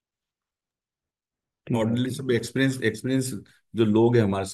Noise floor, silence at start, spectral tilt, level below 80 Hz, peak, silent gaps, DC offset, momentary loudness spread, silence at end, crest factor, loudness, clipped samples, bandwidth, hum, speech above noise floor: under -90 dBFS; 1.65 s; -6 dB/octave; -56 dBFS; -8 dBFS; none; under 0.1%; 11 LU; 0 s; 18 dB; -24 LUFS; under 0.1%; 12.5 kHz; none; over 66 dB